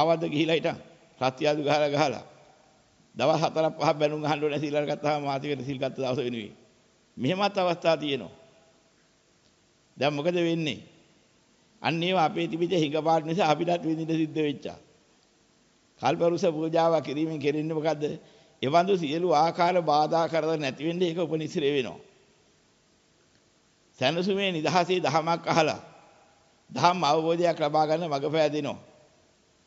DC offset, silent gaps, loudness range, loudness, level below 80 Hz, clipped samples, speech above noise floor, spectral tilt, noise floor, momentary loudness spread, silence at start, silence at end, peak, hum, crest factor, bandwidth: under 0.1%; none; 5 LU; -26 LUFS; -70 dBFS; under 0.1%; 38 dB; -5.5 dB/octave; -64 dBFS; 8 LU; 0 s; 0.85 s; -6 dBFS; none; 22 dB; 8 kHz